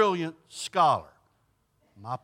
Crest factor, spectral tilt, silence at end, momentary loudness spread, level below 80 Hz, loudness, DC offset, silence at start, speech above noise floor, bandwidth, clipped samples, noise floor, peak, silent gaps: 18 dB; -4.5 dB/octave; 0.05 s; 14 LU; -72 dBFS; -27 LUFS; under 0.1%; 0 s; 44 dB; 16 kHz; under 0.1%; -70 dBFS; -12 dBFS; none